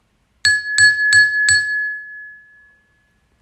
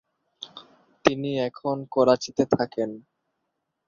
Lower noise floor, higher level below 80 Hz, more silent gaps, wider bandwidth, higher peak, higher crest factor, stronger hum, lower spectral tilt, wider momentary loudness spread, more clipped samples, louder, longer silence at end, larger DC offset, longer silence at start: second, -60 dBFS vs -79 dBFS; first, -56 dBFS vs -62 dBFS; neither; first, 13 kHz vs 7.4 kHz; about the same, -2 dBFS vs -2 dBFS; second, 16 dB vs 24 dB; neither; second, 2.5 dB/octave vs -5.5 dB/octave; about the same, 18 LU vs 20 LU; neither; first, -13 LUFS vs -25 LUFS; first, 1.05 s vs 0.9 s; neither; about the same, 0.45 s vs 0.4 s